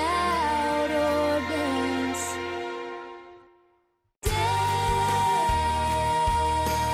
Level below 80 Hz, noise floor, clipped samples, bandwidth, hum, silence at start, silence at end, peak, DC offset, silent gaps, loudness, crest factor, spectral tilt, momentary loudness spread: -40 dBFS; -70 dBFS; under 0.1%; 16 kHz; none; 0 s; 0 s; -14 dBFS; under 0.1%; none; -25 LUFS; 12 dB; -4.5 dB/octave; 10 LU